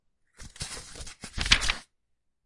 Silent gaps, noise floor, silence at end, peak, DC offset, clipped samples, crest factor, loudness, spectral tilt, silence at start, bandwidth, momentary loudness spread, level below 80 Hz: none; -75 dBFS; 0.65 s; -2 dBFS; under 0.1%; under 0.1%; 30 dB; -27 LUFS; -1 dB/octave; 0.4 s; 11.5 kHz; 19 LU; -40 dBFS